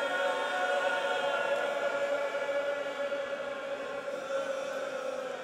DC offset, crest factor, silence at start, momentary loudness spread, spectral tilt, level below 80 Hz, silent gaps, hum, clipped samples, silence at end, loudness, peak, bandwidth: under 0.1%; 14 dB; 0 s; 7 LU; -2 dB/octave; -78 dBFS; none; none; under 0.1%; 0 s; -33 LUFS; -18 dBFS; 14.5 kHz